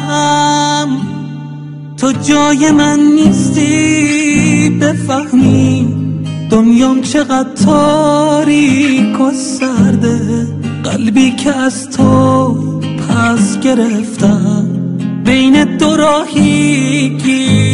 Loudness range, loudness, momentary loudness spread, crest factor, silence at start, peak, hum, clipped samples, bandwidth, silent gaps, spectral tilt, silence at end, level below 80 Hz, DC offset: 2 LU; -10 LUFS; 8 LU; 10 dB; 0 s; 0 dBFS; none; under 0.1%; 11 kHz; none; -5.5 dB/octave; 0 s; -40 dBFS; 0.3%